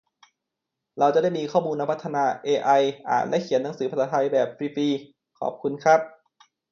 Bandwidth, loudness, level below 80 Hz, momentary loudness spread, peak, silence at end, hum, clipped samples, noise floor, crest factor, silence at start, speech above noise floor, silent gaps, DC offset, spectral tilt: 7.4 kHz; -24 LUFS; -74 dBFS; 9 LU; -6 dBFS; 0.6 s; none; under 0.1%; -84 dBFS; 18 dB; 0.95 s; 61 dB; none; under 0.1%; -5.5 dB/octave